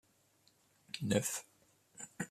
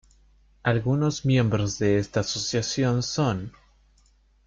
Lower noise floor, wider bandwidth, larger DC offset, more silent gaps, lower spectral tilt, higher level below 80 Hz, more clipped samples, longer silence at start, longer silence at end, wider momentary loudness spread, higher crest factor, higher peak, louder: first, -72 dBFS vs -61 dBFS; first, 14.5 kHz vs 7.6 kHz; neither; neither; second, -4 dB/octave vs -5.5 dB/octave; second, -74 dBFS vs -52 dBFS; neither; first, 0.95 s vs 0.65 s; second, 0 s vs 1 s; first, 17 LU vs 4 LU; first, 24 dB vs 16 dB; second, -18 dBFS vs -10 dBFS; second, -38 LUFS vs -25 LUFS